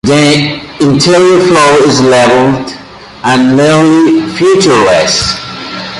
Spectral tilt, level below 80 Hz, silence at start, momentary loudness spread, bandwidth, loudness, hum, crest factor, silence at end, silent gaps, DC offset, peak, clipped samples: -4.5 dB/octave; -38 dBFS; 0.05 s; 11 LU; 11.5 kHz; -7 LUFS; none; 8 dB; 0 s; none; under 0.1%; 0 dBFS; under 0.1%